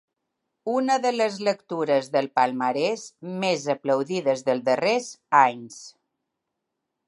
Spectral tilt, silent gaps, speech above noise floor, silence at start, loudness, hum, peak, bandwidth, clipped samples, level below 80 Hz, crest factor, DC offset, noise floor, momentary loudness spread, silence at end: -4.5 dB/octave; none; 58 dB; 0.65 s; -24 LUFS; none; -4 dBFS; 11.5 kHz; under 0.1%; -80 dBFS; 22 dB; under 0.1%; -82 dBFS; 10 LU; 1.15 s